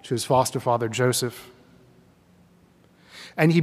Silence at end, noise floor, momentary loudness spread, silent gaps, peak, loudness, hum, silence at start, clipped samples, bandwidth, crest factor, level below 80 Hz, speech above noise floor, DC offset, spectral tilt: 0 s; -57 dBFS; 17 LU; none; -4 dBFS; -23 LUFS; none; 0.05 s; under 0.1%; 16 kHz; 20 dB; -64 dBFS; 35 dB; under 0.1%; -5 dB/octave